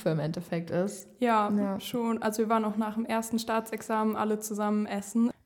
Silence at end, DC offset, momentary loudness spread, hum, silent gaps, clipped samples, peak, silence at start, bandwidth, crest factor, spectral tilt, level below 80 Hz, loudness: 0.15 s; under 0.1%; 5 LU; none; none; under 0.1%; -14 dBFS; 0 s; 18 kHz; 16 dB; -5.5 dB/octave; -70 dBFS; -30 LUFS